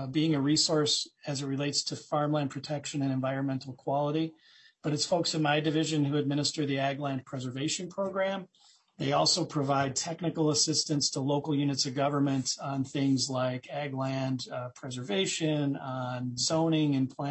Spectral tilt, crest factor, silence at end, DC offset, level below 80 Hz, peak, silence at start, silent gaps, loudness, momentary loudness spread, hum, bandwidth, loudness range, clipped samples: -4.5 dB/octave; 16 dB; 0 s; under 0.1%; -72 dBFS; -14 dBFS; 0 s; none; -30 LUFS; 9 LU; none; 8.6 kHz; 3 LU; under 0.1%